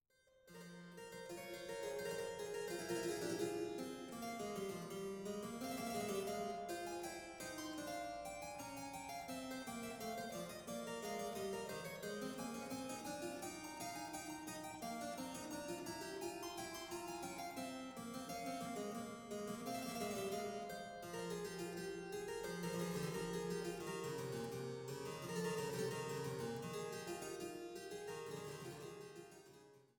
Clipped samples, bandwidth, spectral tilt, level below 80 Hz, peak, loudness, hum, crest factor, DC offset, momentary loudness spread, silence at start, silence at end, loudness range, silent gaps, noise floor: under 0.1%; 18 kHz; -4 dB/octave; -74 dBFS; -30 dBFS; -46 LUFS; none; 18 dB; under 0.1%; 6 LU; 0.35 s; 0.1 s; 3 LU; none; -71 dBFS